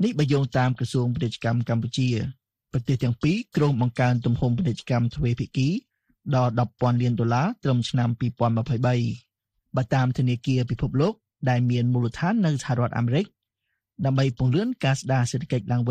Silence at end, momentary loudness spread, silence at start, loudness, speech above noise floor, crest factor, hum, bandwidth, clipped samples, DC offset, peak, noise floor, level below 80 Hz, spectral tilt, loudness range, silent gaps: 0 s; 4 LU; 0 s; -24 LUFS; 57 dB; 14 dB; none; 9.6 kHz; under 0.1%; under 0.1%; -10 dBFS; -80 dBFS; -50 dBFS; -7 dB/octave; 1 LU; none